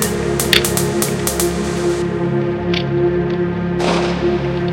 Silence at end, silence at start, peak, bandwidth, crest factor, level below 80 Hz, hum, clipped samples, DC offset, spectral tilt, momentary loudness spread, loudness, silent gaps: 0 s; 0 s; 0 dBFS; 17 kHz; 16 dB; -34 dBFS; none; under 0.1%; under 0.1%; -4.5 dB/octave; 6 LU; -17 LUFS; none